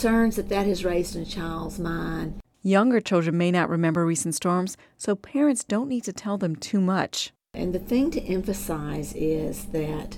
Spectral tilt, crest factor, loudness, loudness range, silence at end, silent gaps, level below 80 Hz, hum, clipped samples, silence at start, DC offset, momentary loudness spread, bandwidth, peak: -5.5 dB/octave; 16 dB; -26 LUFS; 3 LU; 0 s; none; -42 dBFS; none; under 0.1%; 0 s; under 0.1%; 9 LU; 17.5 kHz; -8 dBFS